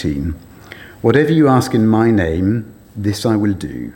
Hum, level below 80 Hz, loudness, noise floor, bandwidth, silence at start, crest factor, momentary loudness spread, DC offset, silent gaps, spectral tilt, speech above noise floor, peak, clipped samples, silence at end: none; -40 dBFS; -15 LUFS; -37 dBFS; 17 kHz; 0 s; 16 dB; 18 LU; under 0.1%; none; -7 dB/octave; 23 dB; 0 dBFS; under 0.1%; 0.05 s